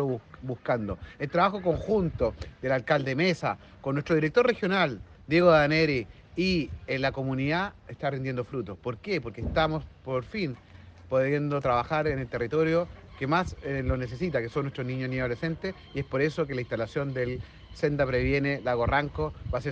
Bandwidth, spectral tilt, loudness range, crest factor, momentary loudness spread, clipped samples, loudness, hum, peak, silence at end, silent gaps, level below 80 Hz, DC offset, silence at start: 8.4 kHz; -7 dB/octave; 6 LU; 20 dB; 11 LU; under 0.1%; -28 LUFS; none; -8 dBFS; 0 s; none; -46 dBFS; under 0.1%; 0 s